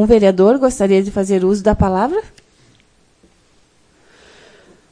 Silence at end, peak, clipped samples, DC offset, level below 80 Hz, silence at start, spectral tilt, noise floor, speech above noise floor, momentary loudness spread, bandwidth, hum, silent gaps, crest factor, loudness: 2.7 s; 0 dBFS; under 0.1%; under 0.1%; -34 dBFS; 0 s; -7 dB/octave; -54 dBFS; 41 dB; 6 LU; 10.5 kHz; none; none; 16 dB; -14 LUFS